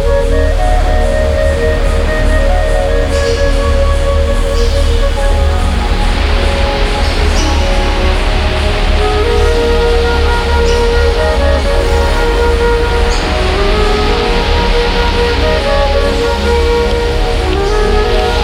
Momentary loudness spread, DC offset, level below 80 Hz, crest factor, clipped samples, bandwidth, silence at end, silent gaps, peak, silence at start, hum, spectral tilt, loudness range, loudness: 2 LU; under 0.1%; -12 dBFS; 10 dB; under 0.1%; 12.5 kHz; 0 s; none; 0 dBFS; 0 s; none; -5.5 dB/octave; 2 LU; -12 LUFS